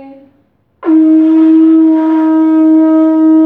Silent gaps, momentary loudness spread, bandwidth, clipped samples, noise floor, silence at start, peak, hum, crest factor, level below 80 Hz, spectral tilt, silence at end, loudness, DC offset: none; 3 LU; 3.4 kHz; under 0.1%; -54 dBFS; 0 s; 0 dBFS; none; 6 dB; -68 dBFS; -7.5 dB/octave; 0 s; -7 LUFS; under 0.1%